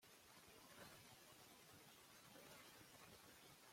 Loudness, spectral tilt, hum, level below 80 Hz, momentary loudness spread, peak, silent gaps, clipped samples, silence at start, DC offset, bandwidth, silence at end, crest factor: -64 LUFS; -2.5 dB/octave; none; -88 dBFS; 3 LU; -48 dBFS; none; under 0.1%; 0 s; under 0.1%; 16.5 kHz; 0 s; 18 dB